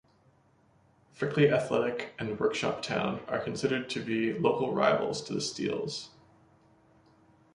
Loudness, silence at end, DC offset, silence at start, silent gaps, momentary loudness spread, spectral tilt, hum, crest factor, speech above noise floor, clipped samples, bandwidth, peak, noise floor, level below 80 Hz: -30 LUFS; 1.45 s; under 0.1%; 1.15 s; none; 10 LU; -5 dB/octave; none; 20 dB; 35 dB; under 0.1%; 11 kHz; -10 dBFS; -65 dBFS; -66 dBFS